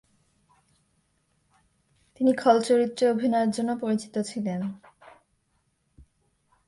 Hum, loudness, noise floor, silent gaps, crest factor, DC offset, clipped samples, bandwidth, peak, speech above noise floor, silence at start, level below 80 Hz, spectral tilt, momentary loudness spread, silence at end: none; -25 LUFS; -72 dBFS; none; 22 dB; under 0.1%; under 0.1%; 11.5 kHz; -6 dBFS; 48 dB; 2.2 s; -68 dBFS; -5.5 dB/octave; 11 LU; 1.9 s